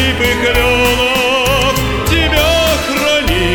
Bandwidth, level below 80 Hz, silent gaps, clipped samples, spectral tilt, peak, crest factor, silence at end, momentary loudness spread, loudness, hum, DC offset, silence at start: 19.5 kHz; -22 dBFS; none; under 0.1%; -3.5 dB/octave; 0 dBFS; 12 dB; 0 s; 3 LU; -12 LUFS; none; under 0.1%; 0 s